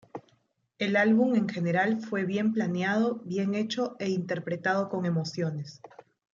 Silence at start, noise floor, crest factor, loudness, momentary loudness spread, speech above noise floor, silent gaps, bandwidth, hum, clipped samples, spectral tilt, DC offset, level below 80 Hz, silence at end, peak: 0.15 s; -71 dBFS; 16 dB; -28 LUFS; 9 LU; 43 dB; none; 7.4 kHz; none; under 0.1%; -6.5 dB/octave; under 0.1%; -76 dBFS; 0.5 s; -12 dBFS